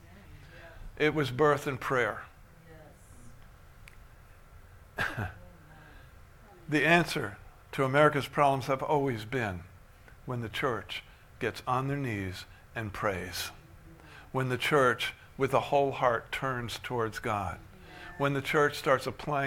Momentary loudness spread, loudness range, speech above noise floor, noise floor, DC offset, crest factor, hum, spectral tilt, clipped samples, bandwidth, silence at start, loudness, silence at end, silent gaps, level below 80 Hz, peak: 19 LU; 13 LU; 24 dB; -54 dBFS; under 0.1%; 22 dB; none; -5.5 dB/octave; under 0.1%; 18 kHz; 0 s; -30 LUFS; 0 s; none; -54 dBFS; -8 dBFS